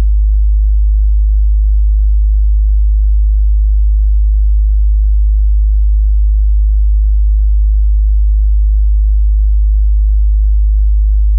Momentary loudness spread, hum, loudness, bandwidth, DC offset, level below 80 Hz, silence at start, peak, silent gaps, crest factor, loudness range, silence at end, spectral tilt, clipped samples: 0 LU; none; -13 LUFS; 0.2 kHz; under 0.1%; -8 dBFS; 0 s; -6 dBFS; none; 4 dB; 0 LU; 0 s; -26.5 dB/octave; under 0.1%